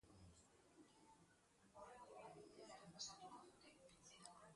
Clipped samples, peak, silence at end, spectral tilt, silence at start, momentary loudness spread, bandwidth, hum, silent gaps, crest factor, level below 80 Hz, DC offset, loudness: under 0.1%; -40 dBFS; 0 s; -2.5 dB/octave; 0.05 s; 14 LU; 11.5 kHz; none; none; 24 dB; -84 dBFS; under 0.1%; -61 LUFS